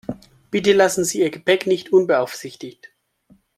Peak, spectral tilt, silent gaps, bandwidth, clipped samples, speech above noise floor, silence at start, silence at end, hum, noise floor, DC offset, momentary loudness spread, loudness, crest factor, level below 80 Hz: -2 dBFS; -4 dB/octave; none; 14 kHz; under 0.1%; 38 dB; 0.1 s; 0.85 s; none; -57 dBFS; under 0.1%; 20 LU; -18 LUFS; 18 dB; -60 dBFS